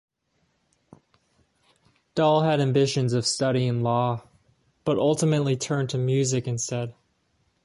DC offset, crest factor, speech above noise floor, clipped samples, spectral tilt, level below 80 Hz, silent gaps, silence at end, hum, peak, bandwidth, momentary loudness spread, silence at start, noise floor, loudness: under 0.1%; 18 dB; 48 dB; under 0.1%; -5.5 dB/octave; -62 dBFS; none; 0.75 s; none; -8 dBFS; 11.5 kHz; 9 LU; 2.15 s; -71 dBFS; -24 LUFS